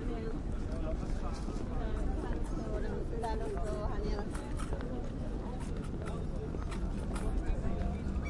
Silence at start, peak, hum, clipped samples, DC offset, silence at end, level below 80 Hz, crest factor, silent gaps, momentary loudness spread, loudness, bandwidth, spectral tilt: 0 s; -20 dBFS; none; under 0.1%; under 0.1%; 0 s; -38 dBFS; 14 dB; none; 3 LU; -39 LUFS; 11.5 kHz; -7.5 dB/octave